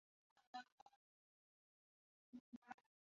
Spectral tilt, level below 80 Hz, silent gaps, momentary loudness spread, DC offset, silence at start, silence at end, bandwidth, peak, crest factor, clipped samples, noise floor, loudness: -1.5 dB/octave; under -90 dBFS; 0.47-0.53 s, 0.72-0.86 s, 0.96-2.33 s, 2.40-2.62 s; 7 LU; under 0.1%; 0.35 s; 0.3 s; 7.2 kHz; -40 dBFS; 24 dB; under 0.1%; under -90 dBFS; -61 LUFS